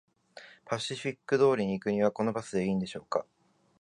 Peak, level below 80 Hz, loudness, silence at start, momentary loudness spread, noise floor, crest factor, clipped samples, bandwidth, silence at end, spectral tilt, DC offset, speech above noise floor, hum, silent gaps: -12 dBFS; -66 dBFS; -30 LUFS; 0.35 s; 11 LU; -54 dBFS; 18 dB; under 0.1%; 11 kHz; 0.6 s; -6 dB/octave; under 0.1%; 24 dB; none; none